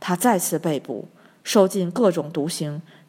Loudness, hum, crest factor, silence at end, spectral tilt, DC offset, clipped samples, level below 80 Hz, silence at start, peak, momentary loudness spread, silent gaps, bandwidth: -22 LUFS; none; 20 dB; 0.25 s; -5 dB/octave; under 0.1%; under 0.1%; -74 dBFS; 0 s; -2 dBFS; 14 LU; none; 16.5 kHz